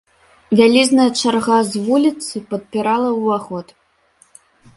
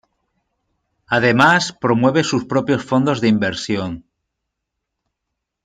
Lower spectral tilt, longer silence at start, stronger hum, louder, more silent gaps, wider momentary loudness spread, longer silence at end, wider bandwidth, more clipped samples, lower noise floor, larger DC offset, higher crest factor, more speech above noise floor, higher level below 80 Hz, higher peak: about the same, -4 dB/octave vs -5 dB/octave; second, 0.5 s vs 1.1 s; neither; about the same, -16 LUFS vs -17 LUFS; neither; first, 14 LU vs 10 LU; second, 1.15 s vs 1.65 s; first, 11.5 kHz vs 9.8 kHz; neither; second, -55 dBFS vs -79 dBFS; neither; about the same, 16 dB vs 18 dB; second, 40 dB vs 63 dB; about the same, -60 dBFS vs -56 dBFS; about the same, 0 dBFS vs 0 dBFS